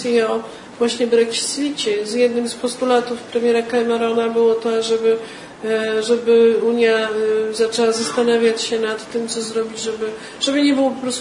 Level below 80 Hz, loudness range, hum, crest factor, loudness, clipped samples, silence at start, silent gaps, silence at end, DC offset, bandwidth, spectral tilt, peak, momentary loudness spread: -62 dBFS; 3 LU; none; 14 dB; -18 LUFS; under 0.1%; 0 s; none; 0 s; under 0.1%; 11 kHz; -3 dB/octave; -4 dBFS; 8 LU